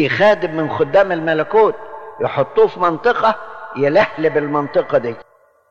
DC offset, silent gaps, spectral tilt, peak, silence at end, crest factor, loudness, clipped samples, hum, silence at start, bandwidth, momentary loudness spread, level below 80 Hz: under 0.1%; none; -7 dB/octave; -4 dBFS; 0.5 s; 12 dB; -16 LUFS; under 0.1%; none; 0 s; 7 kHz; 12 LU; -52 dBFS